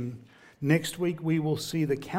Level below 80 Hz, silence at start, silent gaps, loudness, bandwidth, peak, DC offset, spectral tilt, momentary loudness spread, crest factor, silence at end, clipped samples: -64 dBFS; 0 s; none; -29 LUFS; 16 kHz; -10 dBFS; under 0.1%; -6 dB/octave; 10 LU; 20 dB; 0 s; under 0.1%